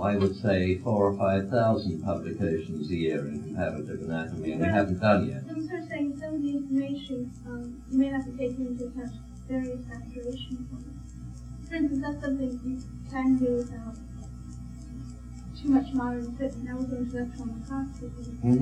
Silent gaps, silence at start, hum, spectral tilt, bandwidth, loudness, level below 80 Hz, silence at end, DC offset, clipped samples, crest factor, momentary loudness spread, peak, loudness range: none; 0 s; none; -8 dB/octave; 9.6 kHz; -30 LUFS; -46 dBFS; 0 s; under 0.1%; under 0.1%; 20 dB; 17 LU; -8 dBFS; 6 LU